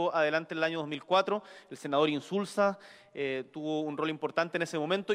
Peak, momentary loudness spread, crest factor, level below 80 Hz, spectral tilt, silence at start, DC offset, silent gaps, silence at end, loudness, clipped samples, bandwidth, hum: -14 dBFS; 8 LU; 18 dB; -78 dBFS; -5 dB/octave; 0 s; under 0.1%; none; 0 s; -31 LUFS; under 0.1%; 14.5 kHz; none